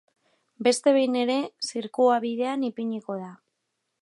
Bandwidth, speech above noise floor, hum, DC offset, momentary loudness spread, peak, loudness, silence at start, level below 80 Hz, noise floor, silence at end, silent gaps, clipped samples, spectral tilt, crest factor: 11.5 kHz; 55 dB; none; under 0.1%; 12 LU; -8 dBFS; -25 LUFS; 0.6 s; -82 dBFS; -79 dBFS; 0.65 s; none; under 0.1%; -4 dB/octave; 18 dB